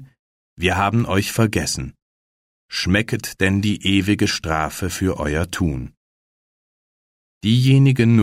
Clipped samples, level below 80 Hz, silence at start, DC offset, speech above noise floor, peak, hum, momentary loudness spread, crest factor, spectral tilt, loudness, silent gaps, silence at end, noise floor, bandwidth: under 0.1%; -40 dBFS; 0 s; under 0.1%; over 72 dB; -4 dBFS; none; 11 LU; 16 dB; -5.5 dB/octave; -19 LUFS; 0.19-0.57 s, 2.02-2.69 s, 5.97-7.41 s; 0 s; under -90 dBFS; 16 kHz